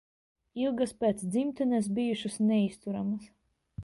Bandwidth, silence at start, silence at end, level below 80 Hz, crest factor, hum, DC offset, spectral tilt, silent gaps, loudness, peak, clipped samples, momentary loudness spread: 11.5 kHz; 0.55 s; 0 s; -64 dBFS; 16 dB; none; under 0.1%; -6 dB/octave; none; -30 LUFS; -16 dBFS; under 0.1%; 8 LU